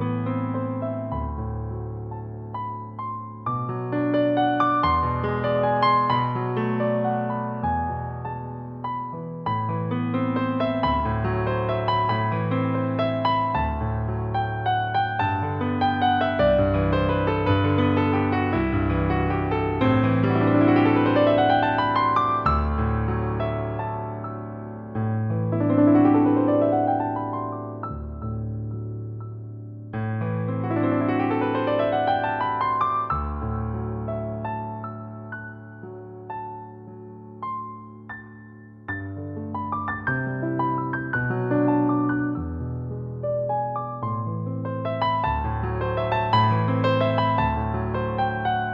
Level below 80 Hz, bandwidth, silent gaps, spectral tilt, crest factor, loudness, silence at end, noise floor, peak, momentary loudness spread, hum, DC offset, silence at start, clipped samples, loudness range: -40 dBFS; 5.4 kHz; none; -9.5 dB/octave; 16 dB; -24 LUFS; 0 s; -44 dBFS; -8 dBFS; 14 LU; none; under 0.1%; 0 s; under 0.1%; 10 LU